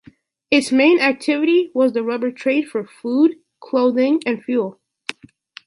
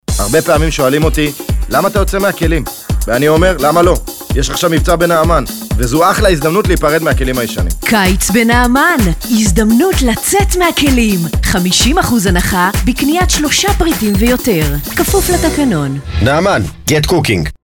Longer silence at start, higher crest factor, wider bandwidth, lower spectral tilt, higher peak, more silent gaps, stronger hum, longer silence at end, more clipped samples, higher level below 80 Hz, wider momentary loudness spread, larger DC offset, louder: first, 0.5 s vs 0.1 s; about the same, 16 dB vs 12 dB; second, 11.5 kHz vs over 20 kHz; about the same, -4.5 dB/octave vs -4.5 dB/octave; about the same, -2 dBFS vs 0 dBFS; neither; neither; first, 0.55 s vs 0.1 s; neither; second, -66 dBFS vs -20 dBFS; first, 13 LU vs 6 LU; neither; second, -18 LUFS vs -12 LUFS